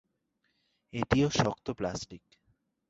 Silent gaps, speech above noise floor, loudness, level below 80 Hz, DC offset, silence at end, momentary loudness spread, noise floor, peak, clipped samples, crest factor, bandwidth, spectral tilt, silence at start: none; 48 dB; -31 LUFS; -52 dBFS; under 0.1%; 0.7 s; 15 LU; -78 dBFS; -10 dBFS; under 0.1%; 24 dB; 8 kHz; -5.5 dB/octave; 0.95 s